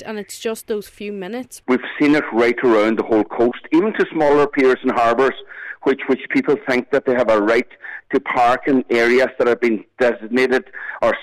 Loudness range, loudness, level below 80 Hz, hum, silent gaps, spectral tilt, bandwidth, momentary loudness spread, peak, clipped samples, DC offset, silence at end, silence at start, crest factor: 2 LU; -17 LUFS; -54 dBFS; none; none; -5.5 dB/octave; 14 kHz; 12 LU; -8 dBFS; under 0.1%; under 0.1%; 0 s; 0 s; 10 dB